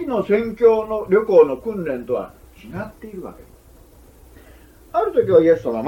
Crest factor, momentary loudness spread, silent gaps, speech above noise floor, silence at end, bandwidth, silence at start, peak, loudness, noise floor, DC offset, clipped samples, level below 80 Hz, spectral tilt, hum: 18 dB; 20 LU; none; 29 dB; 0 s; 15 kHz; 0 s; -2 dBFS; -18 LUFS; -47 dBFS; under 0.1%; under 0.1%; -48 dBFS; -8 dB/octave; none